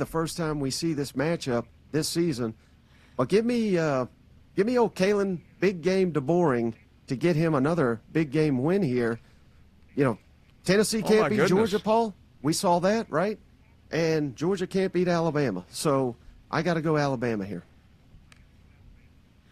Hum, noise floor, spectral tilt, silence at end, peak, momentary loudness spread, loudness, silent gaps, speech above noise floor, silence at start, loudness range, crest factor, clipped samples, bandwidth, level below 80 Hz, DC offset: none; -56 dBFS; -6 dB/octave; 1.35 s; -10 dBFS; 9 LU; -26 LUFS; none; 31 dB; 0 s; 4 LU; 16 dB; under 0.1%; 14.5 kHz; -56 dBFS; under 0.1%